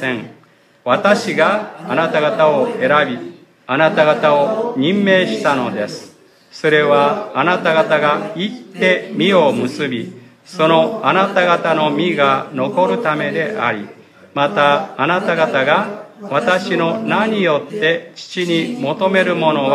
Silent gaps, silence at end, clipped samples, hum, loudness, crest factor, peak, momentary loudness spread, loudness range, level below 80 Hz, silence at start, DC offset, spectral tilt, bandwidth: none; 0 s; under 0.1%; none; -15 LUFS; 16 dB; 0 dBFS; 9 LU; 2 LU; -68 dBFS; 0 s; under 0.1%; -5.5 dB/octave; 13 kHz